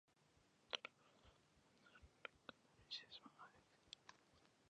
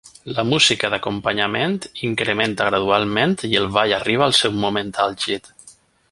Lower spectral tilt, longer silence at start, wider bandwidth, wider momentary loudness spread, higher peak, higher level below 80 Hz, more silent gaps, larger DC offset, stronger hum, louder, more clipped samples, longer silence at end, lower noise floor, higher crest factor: second, -2 dB/octave vs -3.5 dB/octave; about the same, 0.1 s vs 0.05 s; second, 9.6 kHz vs 11.5 kHz; first, 16 LU vs 9 LU; second, -26 dBFS vs -2 dBFS; second, -82 dBFS vs -52 dBFS; neither; neither; neither; second, -56 LUFS vs -19 LUFS; neither; second, 0 s vs 0.4 s; first, -78 dBFS vs -49 dBFS; first, 36 dB vs 18 dB